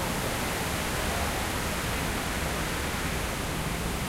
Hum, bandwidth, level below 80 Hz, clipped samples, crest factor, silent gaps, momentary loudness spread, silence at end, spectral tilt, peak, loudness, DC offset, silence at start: none; 16 kHz; -38 dBFS; under 0.1%; 14 dB; none; 2 LU; 0 s; -3.5 dB/octave; -16 dBFS; -30 LUFS; under 0.1%; 0 s